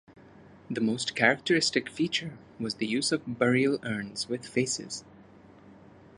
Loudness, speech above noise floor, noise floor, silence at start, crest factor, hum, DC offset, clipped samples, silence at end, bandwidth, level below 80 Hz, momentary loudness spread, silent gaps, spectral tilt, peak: -28 LUFS; 25 dB; -53 dBFS; 0.1 s; 24 dB; none; under 0.1%; under 0.1%; 0.45 s; 11.5 kHz; -68 dBFS; 12 LU; none; -3.5 dB/octave; -6 dBFS